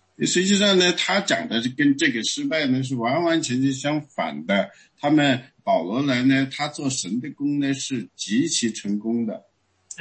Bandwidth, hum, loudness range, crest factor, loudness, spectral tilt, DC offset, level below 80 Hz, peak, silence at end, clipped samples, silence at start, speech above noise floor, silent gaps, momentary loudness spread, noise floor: 8.8 kHz; none; 4 LU; 18 dB; -22 LUFS; -4 dB/octave; under 0.1%; -66 dBFS; -6 dBFS; 0.05 s; under 0.1%; 0.2 s; 24 dB; none; 10 LU; -46 dBFS